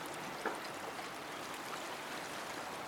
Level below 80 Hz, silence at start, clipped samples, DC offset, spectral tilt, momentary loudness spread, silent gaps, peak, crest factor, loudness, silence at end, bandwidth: -76 dBFS; 0 s; under 0.1%; under 0.1%; -2.5 dB/octave; 3 LU; none; -24 dBFS; 20 dB; -43 LUFS; 0 s; over 20 kHz